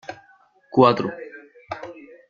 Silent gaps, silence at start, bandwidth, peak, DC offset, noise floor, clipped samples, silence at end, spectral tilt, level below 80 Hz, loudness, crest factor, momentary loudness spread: none; 0.1 s; 7.2 kHz; -2 dBFS; under 0.1%; -56 dBFS; under 0.1%; 0.35 s; -7.5 dB/octave; -64 dBFS; -19 LUFS; 22 dB; 23 LU